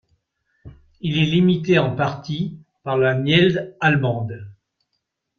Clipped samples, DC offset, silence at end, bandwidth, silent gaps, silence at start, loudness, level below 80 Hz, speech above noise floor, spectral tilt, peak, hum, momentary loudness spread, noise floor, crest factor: under 0.1%; under 0.1%; 0.85 s; 6.8 kHz; none; 0.65 s; -19 LUFS; -54 dBFS; 57 dB; -7 dB/octave; -4 dBFS; none; 13 LU; -76 dBFS; 18 dB